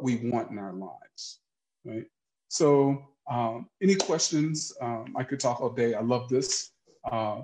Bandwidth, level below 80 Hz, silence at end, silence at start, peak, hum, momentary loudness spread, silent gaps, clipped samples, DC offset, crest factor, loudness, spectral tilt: 10 kHz; -70 dBFS; 0 s; 0 s; -10 dBFS; none; 17 LU; none; under 0.1%; under 0.1%; 18 dB; -28 LUFS; -4.5 dB/octave